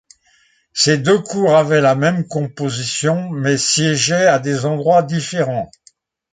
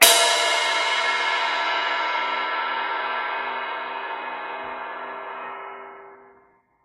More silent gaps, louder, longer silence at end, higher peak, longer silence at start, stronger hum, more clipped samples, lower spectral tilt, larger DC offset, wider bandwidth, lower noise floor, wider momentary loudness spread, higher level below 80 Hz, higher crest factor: neither; first, -16 LUFS vs -23 LUFS; about the same, 0.65 s vs 0.6 s; about the same, -2 dBFS vs 0 dBFS; first, 0.75 s vs 0 s; neither; neither; first, -4 dB/octave vs 2 dB/octave; neither; second, 9.6 kHz vs 15.5 kHz; about the same, -57 dBFS vs -59 dBFS; second, 9 LU vs 15 LU; first, -58 dBFS vs -72 dBFS; second, 14 dB vs 24 dB